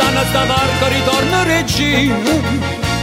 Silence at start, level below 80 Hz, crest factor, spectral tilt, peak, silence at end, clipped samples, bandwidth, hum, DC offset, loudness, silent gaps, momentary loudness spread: 0 s; -30 dBFS; 14 dB; -4.5 dB/octave; 0 dBFS; 0 s; under 0.1%; 16.5 kHz; none; under 0.1%; -14 LUFS; none; 4 LU